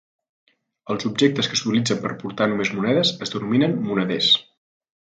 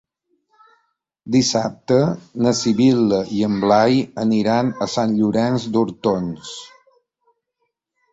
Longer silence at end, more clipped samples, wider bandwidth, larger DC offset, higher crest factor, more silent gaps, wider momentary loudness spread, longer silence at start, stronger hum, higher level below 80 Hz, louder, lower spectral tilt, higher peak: second, 0.65 s vs 1.45 s; neither; first, 9.4 kHz vs 8 kHz; neither; about the same, 18 dB vs 18 dB; neither; about the same, 9 LU vs 7 LU; second, 0.85 s vs 1.25 s; neither; second, -64 dBFS vs -56 dBFS; second, -21 LUFS vs -18 LUFS; about the same, -4.5 dB/octave vs -5.5 dB/octave; about the same, -4 dBFS vs -2 dBFS